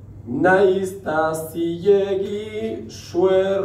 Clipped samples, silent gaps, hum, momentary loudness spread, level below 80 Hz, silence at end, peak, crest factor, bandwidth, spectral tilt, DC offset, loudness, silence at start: under 0.1%; none; none; 12 LU; -52 dBFS; 0 s; -4 dBFS; 16 dB; 15.5 kHz; -6 dB/octave; under 0.1%; -20 LUFS; 0 s